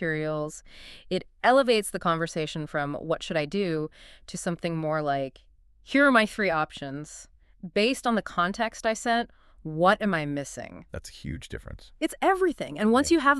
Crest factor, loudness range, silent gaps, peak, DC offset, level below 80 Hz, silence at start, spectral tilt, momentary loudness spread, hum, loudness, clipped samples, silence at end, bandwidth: 20 dB; 4 LU; none; -6 dBFS; under 0.1%; -52 dBFS; 0 s; -4.5 dB/octave; 19 LU; none; -26 LUFS; under 0.1%; 0 s; 13.5 kHz